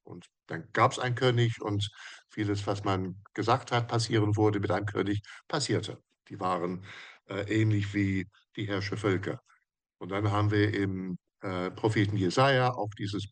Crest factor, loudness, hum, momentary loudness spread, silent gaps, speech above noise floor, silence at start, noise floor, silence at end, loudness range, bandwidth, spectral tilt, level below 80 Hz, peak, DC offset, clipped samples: 20 dB; -30 LUFS; none; 15 LU; none; 42 dB; 0.05 s; -71 dBFS; 0.05 s; 3 LU; 9.8 kHz; -6 dB/octave; -68 dBFS; -10 dBFS; under 0.1%; under 0.1%